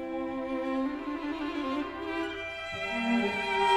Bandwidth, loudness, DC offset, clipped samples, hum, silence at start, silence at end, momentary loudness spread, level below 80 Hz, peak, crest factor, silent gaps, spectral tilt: 14 kHz; -32 LUFS; under 0.1%; under 0.1%; none; 0 s; 0 s; 7 LU; -56 dBFS; -12 dBFS; 18 dB; none; -4.5 dB/octave